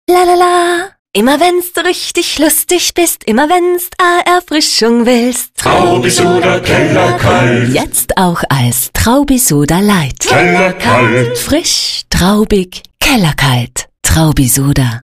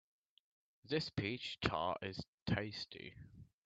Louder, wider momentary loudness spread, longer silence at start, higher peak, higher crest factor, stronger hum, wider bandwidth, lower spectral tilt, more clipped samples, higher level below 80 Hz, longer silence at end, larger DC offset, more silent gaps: first, -10 LUFS vs -41 LUFS; second, 5 LU vs 15 LU; second, 0.1 s vs 0.85 s; first, 0 dBFS vs -18 dBFS; second, 10 dB vs 26 dB; neither; first, 16 kHz vs 8.4 kHz; second, -4 dB/octave vs -6 dB/octave; neither; first, -28 dBFS vs -64 dBFS; second, 0.05 s vs 0.2 s; neither; second, 0.99-1.05 s vs 2.28-2.46 s